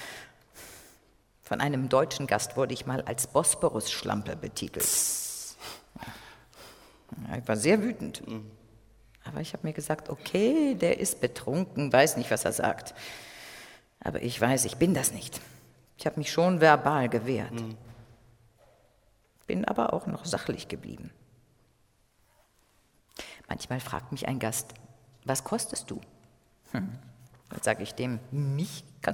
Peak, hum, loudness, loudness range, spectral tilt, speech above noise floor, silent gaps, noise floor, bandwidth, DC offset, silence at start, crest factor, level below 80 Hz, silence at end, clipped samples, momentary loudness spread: -4 dBFS; none; -29 LUFS; 9 LU; -4 dB/octave; 38 dB; none; -67 dBFS; 18 kHz; under 0.1%; 0 s; 26 dB; -60 dBFS; 0 s; under 0.1%; 20 LU